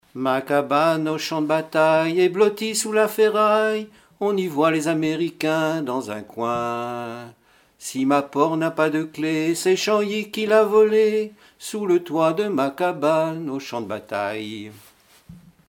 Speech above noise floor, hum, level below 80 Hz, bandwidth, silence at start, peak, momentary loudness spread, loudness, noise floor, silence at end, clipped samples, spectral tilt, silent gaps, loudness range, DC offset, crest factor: 26 dB; none; -68 dBFS; 17.5 kHz; 0.15 s; -4 dBFS; 12 LU; -21 LUFS; -47 dBFS; 0.3 s; under 0.1%; -4.5 dB/octave; none; 5 LU; under 0.1%; 18 dB